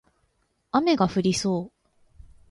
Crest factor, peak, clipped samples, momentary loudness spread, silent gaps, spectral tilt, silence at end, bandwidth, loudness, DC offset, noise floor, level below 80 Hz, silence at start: 18 dB; -8 dBFS; under 0.1%; 8 LU; none; -5.5 dB/octave; 0.8 s; 11.5 kHz; -24 LUFS; under 0.1%; -70 dBFS; -56 dBFS; 0.75 s